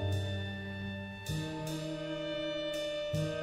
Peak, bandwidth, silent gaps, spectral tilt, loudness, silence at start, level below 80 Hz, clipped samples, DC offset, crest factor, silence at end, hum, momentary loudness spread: -24 dBFS; 16 kHz; none; -5.5 dB/octave; -37 LUFS; 0 s; -56 dBFS; under 0.1%; under 0.1%; 14 dB; 0 s; none; 5 LU